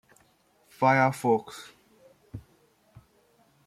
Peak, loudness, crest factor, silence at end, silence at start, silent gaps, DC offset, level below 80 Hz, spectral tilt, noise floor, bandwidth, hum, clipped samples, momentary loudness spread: -8 dBFS; -25 LUFS; 22 dB; 1.25 s; 0.8 s; none; under 0.1%; -66 dBFS; -6.5 dB/octave; -65 dBFS; 15.5 kHz; none; under 0.1%; 25 LU